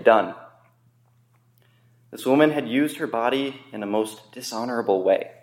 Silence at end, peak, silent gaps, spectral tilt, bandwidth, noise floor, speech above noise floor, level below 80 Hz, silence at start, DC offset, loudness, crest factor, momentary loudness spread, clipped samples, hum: 0.15 s; -2 dBFS; none; -5 dB/octave; 16.5 kHz; -61 dBFS; 38 dB; -78 dBFS; 0 s; under 0.1%; -23 LUFS; 22 dB; 14 LU; under 0.1%; none